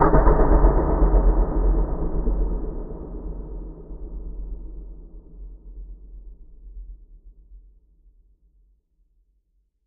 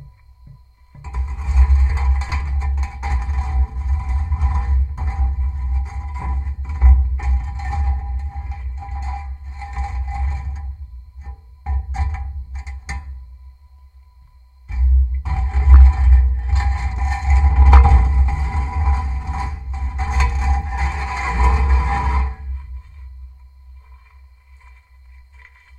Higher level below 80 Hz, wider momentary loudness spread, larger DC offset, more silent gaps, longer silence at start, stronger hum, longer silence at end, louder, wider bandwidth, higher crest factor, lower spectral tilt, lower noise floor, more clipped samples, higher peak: second, -24 dBFS vs -18 dBFS; first, 26 LU vs 17 LU; neither; neither; about the same, 0 s vs 0 s; neither; first, 2.3 s vs 1.8 s; second, -23 LUFS vs -19 LUFS; second, 2.2 kHz vs 7.2 kHz; about the same, 20 dB vs 18 dB; first, -13.5 dB/octave vs -7 dB/octave; first, -67 dBFS vs -47 dBFS; neither; about the same, -2 dBFS vs 0 dBFS